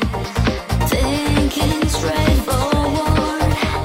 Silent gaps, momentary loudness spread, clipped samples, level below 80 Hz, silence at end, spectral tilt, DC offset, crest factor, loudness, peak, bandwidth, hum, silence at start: none; 3 LU; under 0.1%; -24 dBFS; 0 s; -5.5 dB/octave; under 0.1%; 14 dB; -18 LUFS; -4 dBFS; 16.5 kHz; none; 0 s